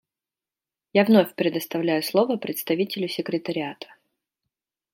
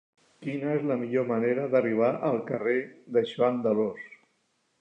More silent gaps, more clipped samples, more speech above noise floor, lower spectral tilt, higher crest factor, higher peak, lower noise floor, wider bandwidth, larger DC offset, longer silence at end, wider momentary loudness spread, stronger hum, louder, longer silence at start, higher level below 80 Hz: neither; neither; first, over 67 dB vs 46 dB; second, -5.5 dB/octave vs -8.5 dB/octave; about the same, 22 dB vs 18 dB; first, -4 dBFS vs -10 dBFS; first, under -90 dBFS vs -73 dBFS; first, 16.5 kHz vs 8 kHz; neither; first, 1.1 s vs 0.65 s; first, 12 LU vs 8 LU; neither; first, -23 LUFS vs -27 LUFS; first, 0.95 s vs 0.4 s; about the same, -74 dBFS vs -78 dBFS